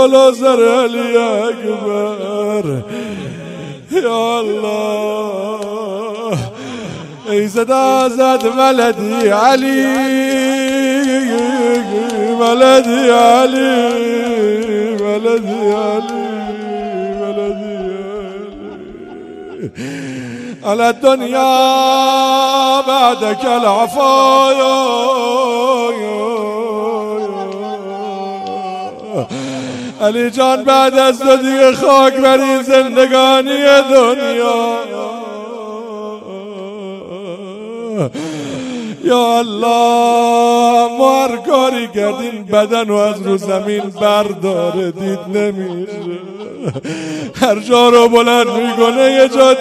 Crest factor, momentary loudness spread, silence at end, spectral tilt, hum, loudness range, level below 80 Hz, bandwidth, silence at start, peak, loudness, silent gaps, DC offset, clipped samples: 12 dB; 17 LU; 0 s; -4 dB/octave; none; 10 LU; -54 dBFS; 15 kHz; 0 s; 0 dBFS; -13 LUFS; none; under 0.1%; 0.3%